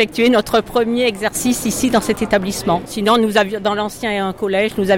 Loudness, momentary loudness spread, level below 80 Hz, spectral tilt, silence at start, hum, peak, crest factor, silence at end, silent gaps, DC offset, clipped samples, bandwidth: -17 LUFS; 6 LU; -44 dBFS; -4 dB/octave; 0 s; none; -4 dBFS; 14 dB; 0 s; none; under 0.1%; under 0.1%; 17 kHz